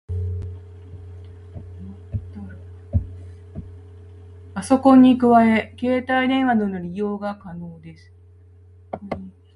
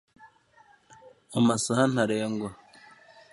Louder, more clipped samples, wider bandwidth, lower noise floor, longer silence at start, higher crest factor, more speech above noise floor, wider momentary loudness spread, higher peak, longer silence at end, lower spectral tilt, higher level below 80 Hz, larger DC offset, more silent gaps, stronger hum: first, -19 LUFS vs -26 LUFS; neither; about the same, 11.5 kHz vs 11.5 kHz; second, -48 dBFS vs -60 dBFS; second, 0.1 s vs 0.25 s; about the same, 20 dB vs 20 dB; second, 30 dB vs 35 dB; first, 26 LU vs 11 LU; first, -2 dBFS vs -8 dBFS; second, 0.25 s vs 0.8 s; first, -7 dB/octave vs -5 dB/octave; first, -40 dBFS vs -66 dBFS; neither; neither; neither